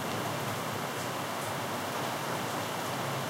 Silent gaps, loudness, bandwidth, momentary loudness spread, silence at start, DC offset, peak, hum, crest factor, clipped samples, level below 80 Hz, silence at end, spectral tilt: none; -34 LUFS; 16 kHz; 1 LU; 0 s; under 0.1%; -20 dBFS; none; 14 dB; under 0.1%; -72 dBFS; 0 s; -3.5 dB/octave